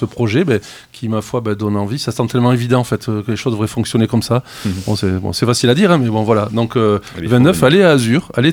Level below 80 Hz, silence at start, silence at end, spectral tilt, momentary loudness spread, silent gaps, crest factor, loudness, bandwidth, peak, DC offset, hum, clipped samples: -46 dBFS; 0 s; 0 s; -6 dB/octave; 9 LU; none; 14 dB; -15 LUFS; 17 kHz; 0 dBFS; under 0.1%; none; under 0.1%